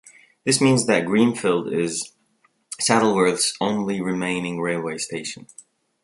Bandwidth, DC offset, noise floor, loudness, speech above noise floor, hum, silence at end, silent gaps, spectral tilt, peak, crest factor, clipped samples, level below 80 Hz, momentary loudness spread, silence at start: 12 kHz; under 0.1%; -64 dBFS; -21 LUFS; 43 dB; none; 0.6 s; none; -4 dB/octave; -2 dBFS; 20 dB; under 0.1%; -64 dBFS; 12 LU; 0.45 s